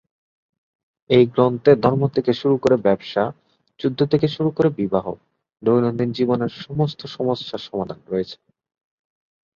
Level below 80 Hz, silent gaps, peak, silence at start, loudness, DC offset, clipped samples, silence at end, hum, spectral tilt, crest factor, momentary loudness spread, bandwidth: -56 dBFS; none; -2 dBFS; 1.1 s; -20 LUFS; under 0.1%; under 0.1%; 1.2 s; none; -8.5 dB/octave; 20 dB; 11 LU; 7.2 kHz